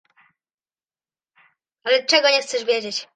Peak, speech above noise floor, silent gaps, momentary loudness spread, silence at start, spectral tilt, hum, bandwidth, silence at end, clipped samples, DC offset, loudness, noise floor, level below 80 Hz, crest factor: -2 dBFS; over 70 dB; none; 7 LU; 1.85 s; -0.5 dB/octave; none; 9.4 kHz; 0.1 s; under 0.1%; under 0.1%; -18 LUFS; under -90 dBFS; -80 dBFS; 22 dB